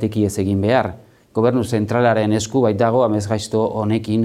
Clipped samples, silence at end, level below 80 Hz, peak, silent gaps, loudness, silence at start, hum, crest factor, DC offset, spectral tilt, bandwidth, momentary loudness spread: under 0.1%; 0 s; -54 dBFS; -2 dBFS; none; -18 LUFS; 0 s; none; 14 dB; under 0.1%; -6.5 dB/octave; 14.5 kHz; 5 LU